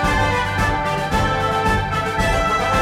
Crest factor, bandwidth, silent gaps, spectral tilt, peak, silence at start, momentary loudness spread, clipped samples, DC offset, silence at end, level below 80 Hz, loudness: 12 dB; 16 kHz; none; -5 dB/octave; -6 dBFS; 0 s; 2 LU; under 0.1%; under 0.1%; 0 s; -28 dBFS; -19 LUFS